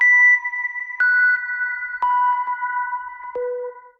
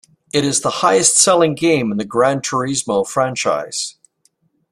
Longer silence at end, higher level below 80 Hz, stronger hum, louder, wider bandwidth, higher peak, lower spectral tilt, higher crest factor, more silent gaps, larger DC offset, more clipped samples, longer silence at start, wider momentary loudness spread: second, 0.1 s vs 0.8 s; second, -66 dBFS vs -58 dBFS; neither; about the same, -18 LUFS vs -16 LUFS; second, 6.2 kHz vs 14.5 kHz; second, -8 dBFS vs 0 dBFS; second, -0.5 dB/octave vs -3 dB/octave; second, 12 dB vs 18 dB; neither; neither; neither; second, 0 s vs 0.35 s; first, 15 LU vs 10 LU